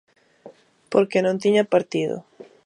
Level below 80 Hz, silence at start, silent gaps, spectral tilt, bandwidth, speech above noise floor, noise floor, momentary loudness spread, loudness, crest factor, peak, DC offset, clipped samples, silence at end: -72 dBFS; 0.45 s; none; -6 dB/octave; 10.5 kHz; 28 dB; -48 dBFS; 8 LU; -21 LUFS; 20 dB; -4 dBFS; under 0.1%; under 0.1%; 0.2 s